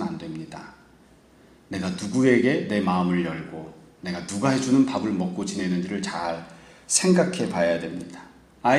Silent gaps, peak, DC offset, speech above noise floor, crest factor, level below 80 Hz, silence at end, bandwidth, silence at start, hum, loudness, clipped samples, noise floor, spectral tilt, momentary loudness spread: none; -4 dBFS; under 0.1%; 30 dB; 20 dB; -60 dBFS; 0 s; 12.5 kHz; 0 s; none; -24 LUFS; under 0.1%; -54 dBFS; -5 dB/octave; 18 LU